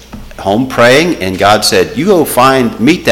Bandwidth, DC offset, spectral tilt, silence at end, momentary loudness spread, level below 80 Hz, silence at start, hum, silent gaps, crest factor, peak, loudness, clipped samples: 17.5 kHz; under 0.1%; -4 dB/octave; 0 s; 7 LU; -36 dBFS; 0.1 s; none; none; 10 dB; 0 dBFS; -9 LUFS; 0.1%